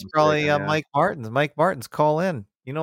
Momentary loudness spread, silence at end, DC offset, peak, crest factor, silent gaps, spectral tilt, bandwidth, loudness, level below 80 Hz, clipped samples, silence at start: 7 LU; 0 s; under 0.1%; -6 dBFS; 18 dB; none; -6 dB/octave; 16.5 kHz; -22 LUFS; -62 dBFS; under 0.1%; 0 s